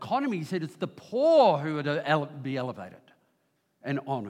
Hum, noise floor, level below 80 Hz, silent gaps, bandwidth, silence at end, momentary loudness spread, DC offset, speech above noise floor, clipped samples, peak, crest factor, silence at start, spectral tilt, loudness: none; -73 dBFS; -82 dBFS; none; 12.5 kHz; 0 s; 16 LU; under 0.1%; 46 dB; under 0.1%; -10 dBFS; 18 dB; 0 s; -7 dB/octave; -27 LUFS